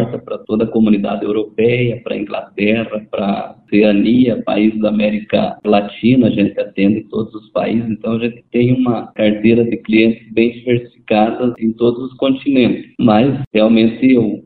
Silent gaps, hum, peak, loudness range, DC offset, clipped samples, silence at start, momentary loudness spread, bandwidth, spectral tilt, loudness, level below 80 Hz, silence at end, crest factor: 13.47-13.51 s; none; 0 dBFS; 3 LU; under 0.1%; under 0.1%; 0 s; 8 LU; 4.6 kHz; -11.5 dB/octave; -15 LUFS; -48 dBFS; 0.05 s; 14 dB